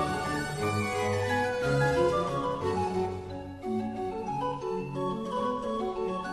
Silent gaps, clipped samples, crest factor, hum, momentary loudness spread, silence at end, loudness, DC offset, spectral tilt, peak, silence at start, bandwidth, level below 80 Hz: none; under 0.1%; 14 dB; none; 8 LU; 0 s; -30 LUFS; under 0.1%; -6 dB/octave; -16 dBFS; 0 s; 12.5 kHz; -52 dBFS